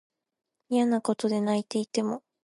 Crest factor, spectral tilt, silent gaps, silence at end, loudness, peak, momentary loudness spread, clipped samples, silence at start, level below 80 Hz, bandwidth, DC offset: 16 dB; -5.5 dB/octave; none; 0.25 s; -28 LUFS; -12 dBFS; 5 LU; under 0.1%; 0.7 s; -78 dBFS; 11.5 kHz; under 0.1%